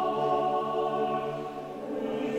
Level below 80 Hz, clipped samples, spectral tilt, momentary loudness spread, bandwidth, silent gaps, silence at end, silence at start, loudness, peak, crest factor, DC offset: -64 dBFS; under 0.1%; -6.5 dB/octave; 9 LU; 14 kHz; none; 0 s; 0 s; -30 LUFS; -16 dBFS; 14 dB; under 0.1%